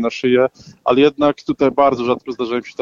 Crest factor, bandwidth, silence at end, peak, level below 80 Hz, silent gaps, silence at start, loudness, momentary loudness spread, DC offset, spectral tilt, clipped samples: 14 dB; 7.4 kHz; 0.1 s; -2 dBFS; -52 dBFS; none; 0 s; -17 LUFS; 8 LU; under 0.1%; -6 dB/octave; under 0.1%